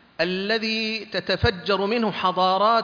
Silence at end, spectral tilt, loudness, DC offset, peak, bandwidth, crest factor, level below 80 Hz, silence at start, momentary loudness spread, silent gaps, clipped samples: 0 s; -5.5 dB/octave; -23 LUFS; under 0.1%; -8 dBFS; 5.4 kHz; 16 dB; -44 dBFS; 0.2 s; 6 LU; none; under 0.1%